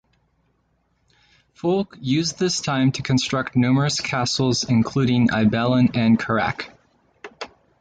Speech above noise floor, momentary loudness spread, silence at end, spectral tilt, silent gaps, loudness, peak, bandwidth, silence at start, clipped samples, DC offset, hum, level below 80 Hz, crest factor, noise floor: 47 dB; 11 LU; 0.35 s; -5 dB/octave; none; -20 LUFS; -6 dBFS; 9.2 kHz; 1.65 s; under 0.1%; under 0.1%; none; -52 dBFS; 16 dB; -67 dBFS